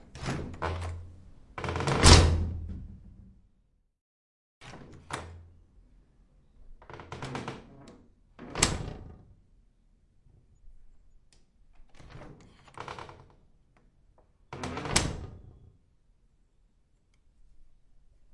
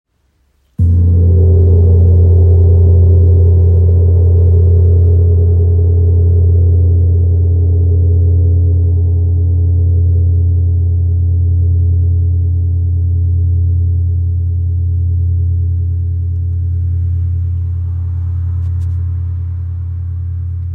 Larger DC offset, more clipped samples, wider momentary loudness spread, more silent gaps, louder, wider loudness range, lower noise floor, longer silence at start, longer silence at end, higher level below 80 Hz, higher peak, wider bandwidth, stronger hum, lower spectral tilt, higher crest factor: neither; neither; first, 28 LU vs 9 LU; first, 4.01-4.61 s vs none; second, -28 LUFS vs -12 LUFS; first, 24 LU vs 8 LU; first, -69 dBFS vs -58 dBFS; second, 0.15 s vs 0.8 s; first, 0.7 s vs 0 s; second, -40 dBFS vs -26 dBFS; about the same, -2 dBFS vs -2 dBFS; first, 11.5 kHz vs 1 kHz; neither; second, -4 dB/octave vs -13.5 dB/octave; first, 30 dB vs 8 dB